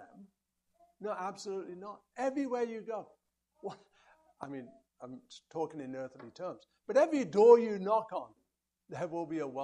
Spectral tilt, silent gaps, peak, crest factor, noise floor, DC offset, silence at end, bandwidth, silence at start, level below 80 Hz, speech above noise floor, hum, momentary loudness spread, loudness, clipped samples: -6 dB/octave; none; -10 dBFS; 24 dB; -82 dBFS; under 0.1%; 0 s; 9 kHz; 0 s; -82 dBFS; 50 dB; none; 23 LU; -32 LUFS; under 0.1%